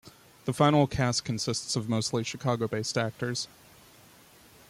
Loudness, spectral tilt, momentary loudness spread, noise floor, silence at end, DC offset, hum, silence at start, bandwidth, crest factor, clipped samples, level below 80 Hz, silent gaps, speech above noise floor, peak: -28 LUFS; -5 dB/octave; 11 LU; -56 dBFS; 1.25 s; under 0.1%; none; 0.05 s; 16 kHz; 20 dB; under 0.1%; -58 dBFS; none; 28 dB; -10 dBFS